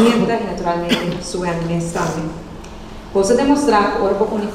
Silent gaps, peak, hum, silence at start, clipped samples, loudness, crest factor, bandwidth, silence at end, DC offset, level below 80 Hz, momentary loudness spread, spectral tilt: none; 0 dBFS; none; 0 s; under 0.1%; -18 LUFS; 16 dB; 15.5 kHz; 0 s; under 0.1%; -38 dBFS; 18 LU; -5.5 dB/octave